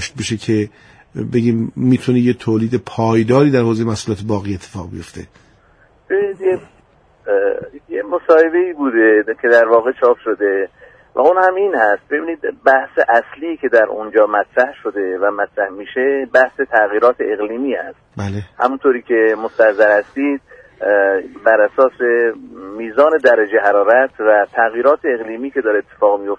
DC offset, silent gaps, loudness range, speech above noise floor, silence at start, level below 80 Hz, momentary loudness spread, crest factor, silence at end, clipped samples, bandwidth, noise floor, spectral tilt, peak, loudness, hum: under 0.1%; none; 5 LU; 37 dB; 0 s; -54 dBFS; 13 LU; 16 dB; 0.05 s; under 0.1%; 10.5 kHz; -51 dBFS; -6.5 dB/octave; 0 dBFS; -15 LUFS; none